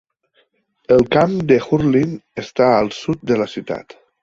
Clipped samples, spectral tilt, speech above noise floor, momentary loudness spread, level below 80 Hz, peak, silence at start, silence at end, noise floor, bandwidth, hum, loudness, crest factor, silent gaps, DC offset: under 0.1%; -7 dB/octave; 46 dB; 12 LU; -48 dBFS; -2 dBFS; 0.9 s; 0.4 s; -62 dBFS; 7.8 kHz; none; -17 LUFS; 16 dB; none; under 0.1%